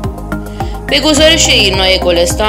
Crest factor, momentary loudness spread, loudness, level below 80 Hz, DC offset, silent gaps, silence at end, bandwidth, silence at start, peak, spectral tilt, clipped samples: 10 dB; 15 LU; -8 LUFS; -22 dBFS; under 0.1%; none; 0 s; 16.5 kHz; 0 s; 0 dBFS; -3 dB/octave; 0.6%